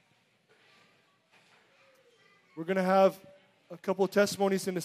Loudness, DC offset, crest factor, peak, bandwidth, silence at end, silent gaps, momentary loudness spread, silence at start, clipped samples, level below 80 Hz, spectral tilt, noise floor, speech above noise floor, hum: -28 LUFS; under 0.1%; 20 dB; -12 dBFS; 15.5 kHz; 0 s; none; 25 LU; 2.55 s; under 0.1%; -82 dBFS; -5 dB/octave; -69 dBFS; 41 dB; none